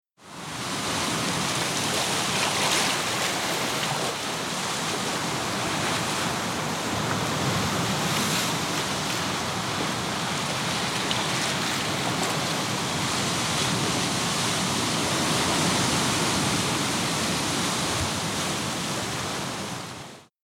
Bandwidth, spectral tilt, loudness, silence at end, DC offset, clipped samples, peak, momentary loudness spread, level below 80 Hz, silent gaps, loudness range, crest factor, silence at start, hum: 16.5 kHz; -2.5 dB/octave; -25 LUFS; 0.2 s; under 0.1%; under 0.1%; -8 dBFS; 5 LU; -52 dBFS; none; 3 LU; 18 dB; 0.2 s; none